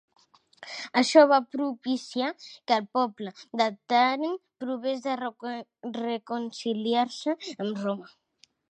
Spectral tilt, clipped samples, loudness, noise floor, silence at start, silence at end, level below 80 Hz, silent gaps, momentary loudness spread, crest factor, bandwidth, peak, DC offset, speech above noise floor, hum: -4 dB/octave; under 0.1%; -27 LUFS; -53 dBFS; 0.6 s; 0.65 s; -84 dBFS; none; 16 LU; 22 dB; 9.4 kHz; -6 dBFS; under 0.1%; 26 dB; none